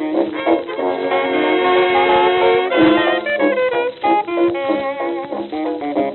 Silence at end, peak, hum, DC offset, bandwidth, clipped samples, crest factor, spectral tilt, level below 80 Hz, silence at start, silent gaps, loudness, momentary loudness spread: 0 s; -2 dBFS; none; under 0.1%; 4.3 kHz; under 0.1%; 14 dB; -9 dB/octave; -56 dBFS; 0 s; none; -16 LUFS; 9 LU